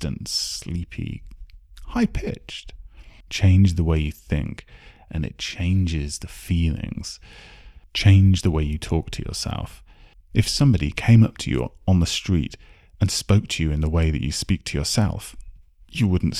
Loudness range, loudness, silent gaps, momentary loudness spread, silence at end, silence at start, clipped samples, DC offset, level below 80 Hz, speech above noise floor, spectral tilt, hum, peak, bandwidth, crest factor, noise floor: 6 LU; -22 LUFS; none; 16 LU; 0 s; 0 s; under 0.1%; under 0.1%; -34 dBFS; 28 dB; -5.5 dB/octave; none; -4 dBFS; 14 kHz; 18 dB; -49 dBFS